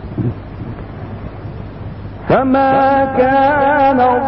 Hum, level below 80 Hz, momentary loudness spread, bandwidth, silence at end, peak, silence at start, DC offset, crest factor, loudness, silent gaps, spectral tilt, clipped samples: none; -36 dBFS; 17 LU; 5.8 kHz; 0 s; -2 dBFS; 0 s; under 0.1%; 12 dB; -13 LUFS; none; -10.5 dB/octave; under 0.1%